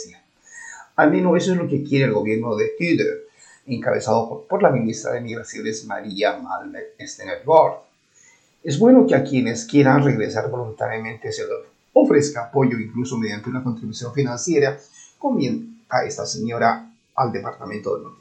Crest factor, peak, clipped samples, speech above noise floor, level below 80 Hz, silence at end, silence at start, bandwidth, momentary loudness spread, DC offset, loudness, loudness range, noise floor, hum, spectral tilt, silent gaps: 20 dB; 0 dBFS; under 0.1%; 35 dB; -66 dBFS; 0.05 s; 0 s; 9 kHz; 15 LU; under 0.1%; -20 LUFS; 5 LU; -55 dBFS; none; -6 dB/octave; none